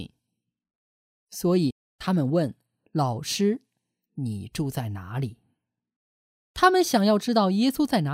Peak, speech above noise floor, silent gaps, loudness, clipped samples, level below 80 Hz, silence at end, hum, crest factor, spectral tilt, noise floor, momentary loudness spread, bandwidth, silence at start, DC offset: -6 dBFS; 59 dB; 0.75-1.27 s, 1.72-1.99 s, 5.96-6.54 s; -25 LUFS; under 0.1%; -58 dBFS; 0 s; none; 20 dB; -5.5 dB/octave; -82 dBFS; 13 LU; 16 kHz; 0 s; under 0.1%